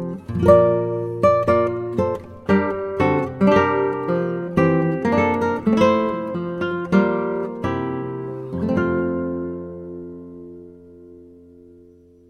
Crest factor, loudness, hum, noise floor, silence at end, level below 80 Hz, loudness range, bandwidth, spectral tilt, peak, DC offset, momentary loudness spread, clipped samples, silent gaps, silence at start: 18 dB; -20 LUFS; none; -49 dBFS; 1 s; -50 dBFS; 8 LU; 9.6 kHz; -8.5 dB/octave; -2 dBFS; under 0.1%; 14 LU; under 0.1%; none; 0 s